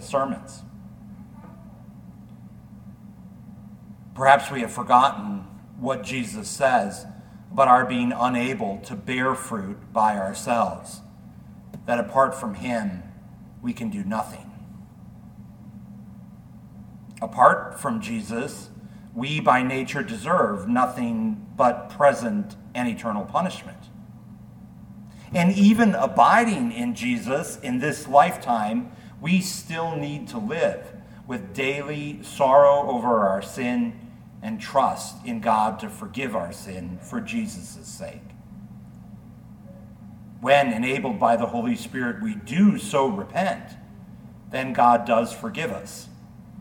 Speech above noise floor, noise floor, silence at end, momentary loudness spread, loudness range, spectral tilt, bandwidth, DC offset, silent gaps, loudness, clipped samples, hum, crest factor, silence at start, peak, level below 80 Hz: 22 dB; -44 dBFS; 0 s; 26 LU; 12 LU; -5.5 dB/octave; 18.5 kHz; under 0.1%; none; -23 LUFS; under 0.1%; none; 24 dB; 0 s; 0 dBFS; -56 dBFS